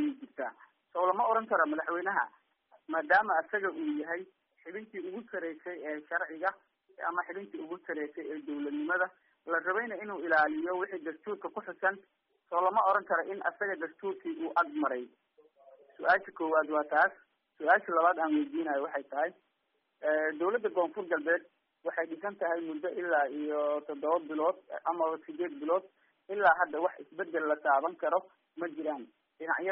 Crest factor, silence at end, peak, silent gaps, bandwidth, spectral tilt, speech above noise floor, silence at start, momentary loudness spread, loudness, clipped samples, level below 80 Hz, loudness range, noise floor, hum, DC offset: 20 dB; 0 s; -12 dBFS; none; 4 kHz; -2 dB/octave; 47 dB; 0 s; 13 LU; -32 LUFS; under 0.1%; -84 dBFS; 6 LU; -79 dBFS; none; under 0.1%